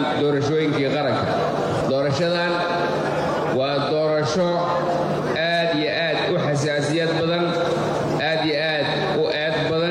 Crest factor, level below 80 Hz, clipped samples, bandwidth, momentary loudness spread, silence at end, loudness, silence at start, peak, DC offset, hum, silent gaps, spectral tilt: 10 dB; -54 dBFS; under 0.1%; 12 kHz; 2 LU; 0 s; -21 LUFS; 0 s; -12 dBFS; under 0.1%; none; none; -5.5 dB/octave